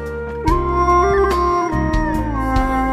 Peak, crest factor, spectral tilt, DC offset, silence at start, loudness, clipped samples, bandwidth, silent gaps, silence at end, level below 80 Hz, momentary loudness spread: -2 dBFS; 14 dB; -7 dB/octave; under 0.1%; 0 s; -17 LUFS; under 0.1%; 14.5 kHz; none; 0 s; -24 dBFS; 6 LU